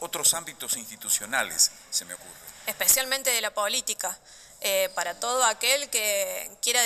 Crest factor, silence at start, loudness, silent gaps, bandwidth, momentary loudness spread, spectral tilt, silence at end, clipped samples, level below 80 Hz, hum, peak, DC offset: 20 dB; 0 s; -25 LUFS; none; 15.5 kHz; 11 LU; 1.5 dB/octave; 0 s; under 0.1%; -64 dBFS; none; -6 dBFS; under 0.1%